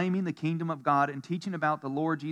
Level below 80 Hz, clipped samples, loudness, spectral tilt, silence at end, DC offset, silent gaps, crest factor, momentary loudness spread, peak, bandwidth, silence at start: -90 dBFS; under 0.1%; -30 LUFS; -7.5 dB/octave; 0 s; under 0.1%; none; 16 dB; 5 LU; -14 dBFS; 10.5 kHz; 0 s